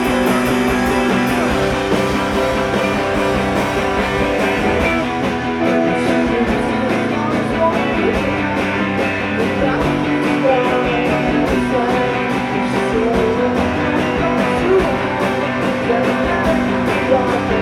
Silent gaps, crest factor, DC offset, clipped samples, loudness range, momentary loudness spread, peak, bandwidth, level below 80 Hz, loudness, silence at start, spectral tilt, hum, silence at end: none; 14 dB; under 0.1%; under 0.1%; 1 LU; 3 LU; -2 dBFS; 16 kHz; -34 dBFS; -16 LUFS; 0 s; -6 dB/octave; none; 0 s